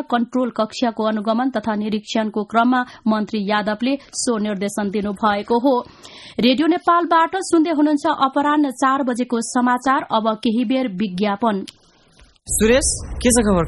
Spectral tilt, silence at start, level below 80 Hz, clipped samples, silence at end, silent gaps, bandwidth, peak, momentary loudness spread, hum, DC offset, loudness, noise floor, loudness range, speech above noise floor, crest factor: -4 dB/octave; 0 s; -40 dBFS; under 0.1%; 0 s; none; 12 kHz; -2 dBFS; 7 LU; none; under 0.1%; -19 LUFS; -51 dBFS; 3 LU; 33 dB; 16 dB